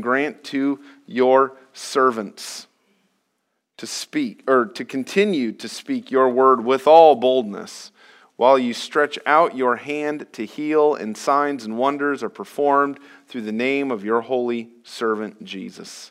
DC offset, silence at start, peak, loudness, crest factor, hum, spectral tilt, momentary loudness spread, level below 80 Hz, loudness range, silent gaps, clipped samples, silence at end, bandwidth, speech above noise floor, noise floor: under 0.1%; 0 s; 0 dBFS; -20 LUFS; 20 dB; none; -4.5 dB/octave; 17 LU; -80 dBFS; 7 LU; none; under 0.1%; 0.05 s; 15 kHz; 54 dB; -74 dBFS